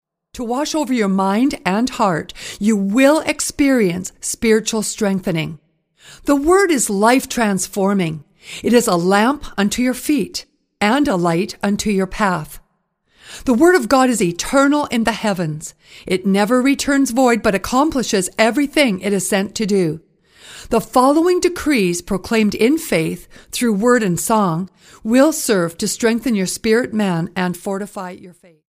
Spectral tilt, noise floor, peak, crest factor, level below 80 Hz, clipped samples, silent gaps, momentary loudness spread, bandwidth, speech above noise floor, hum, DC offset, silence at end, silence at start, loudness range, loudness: -4.5 dB/octave; -65 dBFS; 0 dBFS; 16 dB; -44 dBFS; under 0.1%; none; 11 LU; 15.5 kHz; 49 dB; none; under 0.1%; 0.5 s; 0.35 s; 2 LU; -17 LUFS